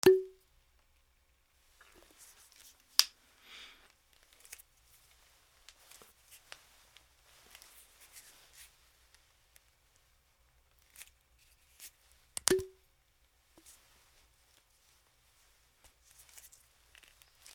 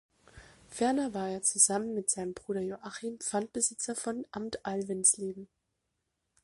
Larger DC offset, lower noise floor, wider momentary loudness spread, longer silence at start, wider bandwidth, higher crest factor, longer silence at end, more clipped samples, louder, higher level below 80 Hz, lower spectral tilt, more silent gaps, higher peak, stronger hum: neither; second, -71 dBFS vs -83 dBFS; first, 30 LU vs 14 LU; second, 0.05 s vs 0.35 s; first, 20 kHz vs 11.5 kHz; first, 40 dB vs 24 dB; first, 4.9 s vs 1 s; neither; about the same, -32 LUFS vs -31 LUFS; about the same, -70 dBFS vs -68 dBFS; about the same, -2.5 dB/octave vs -3 dB/octave; neither; first, 0 dBFS vs -8 dBFS; neither